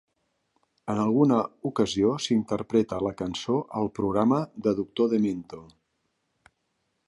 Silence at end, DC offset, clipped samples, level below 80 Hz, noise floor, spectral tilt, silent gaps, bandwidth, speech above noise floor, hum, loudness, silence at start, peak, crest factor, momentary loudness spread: 1.45 s; under 0.1%; under 0.1%; -58 dBFS; -76 dBFS; -6.5 dB/octave; none; 11 kHz; 51 dB; none; -26 LUFS; 0.85 s; -8 dBFS; 18 dB; 9 LU